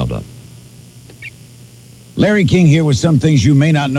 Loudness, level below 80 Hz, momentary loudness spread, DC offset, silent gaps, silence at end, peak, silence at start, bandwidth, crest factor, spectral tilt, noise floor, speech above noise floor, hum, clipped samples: -12 LUFS; -38 dBFS; 22 LU; under 0.1%; none; 0 s; -2 dBFS; 0 s; 12 kHz; 12 dB; -6.5 dB/octave; -39 dBFS; 29 dB; none; under 0.1%